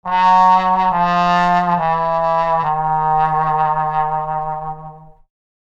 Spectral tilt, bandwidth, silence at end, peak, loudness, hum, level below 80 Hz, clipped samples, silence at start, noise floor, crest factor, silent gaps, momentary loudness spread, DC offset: -6.5 dB/octave; 7.8 kHz; 0.65 s; -2 dBFS; -15 LUFS; none; -42 dBFS; under 0.1%; 0.05 s; -37 dBFS; 14 dB; none; 10 LU; under 0.1%